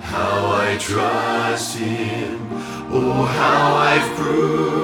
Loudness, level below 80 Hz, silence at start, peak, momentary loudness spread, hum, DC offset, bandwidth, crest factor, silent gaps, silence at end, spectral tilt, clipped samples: -19 LUFS; -48 dBFS; 0 s; -2 dBFS; 10 LU; none; under 0.1%; 19 kHz; 16 dB; none; 0 s; -5 dB/octave; under 0.1%